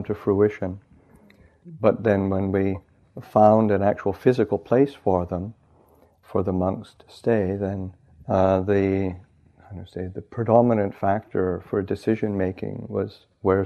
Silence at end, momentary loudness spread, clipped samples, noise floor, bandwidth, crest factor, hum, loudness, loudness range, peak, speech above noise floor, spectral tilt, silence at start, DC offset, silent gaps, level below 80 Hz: 0 s; 15 LU; under 0.1%; -57 dBFS; 9.2 kHz; 20 dB; none; -23 LUFS; 4 LU; -4 dBFS; 35 dB; -9.5 dB/octave; 0 s; under 0.1%; none; -54 dBFS